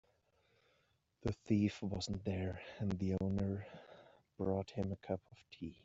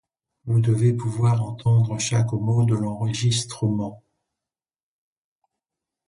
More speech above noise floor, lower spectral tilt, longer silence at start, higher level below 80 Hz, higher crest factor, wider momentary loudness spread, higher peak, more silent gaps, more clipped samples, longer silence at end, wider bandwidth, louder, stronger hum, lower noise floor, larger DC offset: second, 38 dB vs over 69 dB; about the same, -7 dB/octave vs -6 dB/octave; first, 1.25 s vs 0.45 s; second, -62 dBFS vs -54 dBFS; about the same, 18 dB vs 14 dB; first, 15 LU vs 5 LU; second, -22 dBFS vs -8 dBFS; neither; neither; second, 0.1 s vs 2.1 s; second, 8 kHz vs 11 kHz; second, -40 LUFS vs -22 LUFS; neither; second, -78 dBFS vs under -90 dBFS; neither